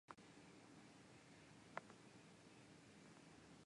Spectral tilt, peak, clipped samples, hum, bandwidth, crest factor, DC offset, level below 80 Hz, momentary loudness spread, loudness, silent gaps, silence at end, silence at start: -4.5 dB/octave; -30 dBFS; under 0.1%; none; 11 kHz; 34 dB; under 0.1%; -86 dBFS; 8 LU; -63 LUFS; none; 0 s; 0.1 s